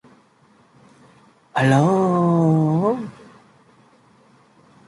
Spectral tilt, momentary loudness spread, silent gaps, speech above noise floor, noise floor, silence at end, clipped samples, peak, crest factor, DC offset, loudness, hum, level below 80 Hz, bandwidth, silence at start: -8 dB/octave; 12 LU; none; 39 dB; -56 dBFS; 1.75 s; under 0.1%; -2 dBFS; 18 dB; under 0.1%; -18 LUFS; none; -62 dBFS; 11.5 kHz; 1.55 s